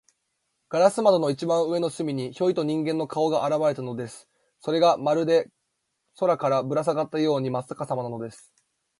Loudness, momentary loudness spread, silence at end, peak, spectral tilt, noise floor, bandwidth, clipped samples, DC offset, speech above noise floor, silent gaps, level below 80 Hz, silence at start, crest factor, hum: -24 LUFS; 12 LU; 0.65 s; -4 dBFS; -6 dB/octave; -77 dBFS; 11.5 kHz; under 0.1%; under 0.1%; 53 dB; none; -72 dBFS; 0.7 s; 20 dB; none